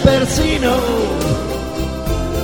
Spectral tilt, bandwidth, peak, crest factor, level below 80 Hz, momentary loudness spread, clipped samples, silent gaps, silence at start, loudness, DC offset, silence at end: -5 dB/octave; over 20 kHz; 0 dBFS; 16 dB; -24 dBFS; 7 LU; under 0.1%; none; 0 s; -17 LUFS; 0.9%; 0 s